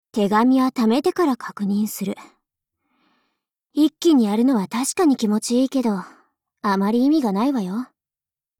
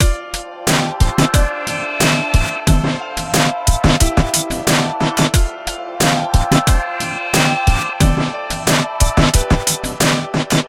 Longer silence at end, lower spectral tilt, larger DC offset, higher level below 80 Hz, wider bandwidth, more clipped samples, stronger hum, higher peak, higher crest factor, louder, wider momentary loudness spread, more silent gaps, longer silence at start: first, 0.75 s vs 0 s; first, -5.5 dB/octave vs -4 dB/octave; neither; second, -66 dBFS vs -20 dBFS; about the same, 17.5 kHz vs 17 kHz; neither; neither; second, -6 dBFS vs 0 dBFS; about the same, 14 dB vs 16 dB; second, -20 LUFS vs -16 LUFS; first, 11 LU vs 7 LU; neither; first, 0.15 s vs 0 s